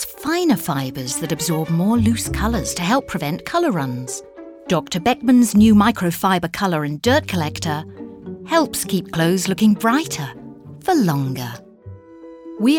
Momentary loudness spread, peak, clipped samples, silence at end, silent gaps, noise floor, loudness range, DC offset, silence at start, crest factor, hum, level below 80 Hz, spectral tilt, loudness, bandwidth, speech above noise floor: 17 LU; -4 dBFS; under 0.1%; 0 s; none; -40 dBFS; 4 LU; under 0.1%; 0 s; 16 dB; none; -40 dBFS; -5 dB/octave; -19 LUFS; 19 kHz; 22 dB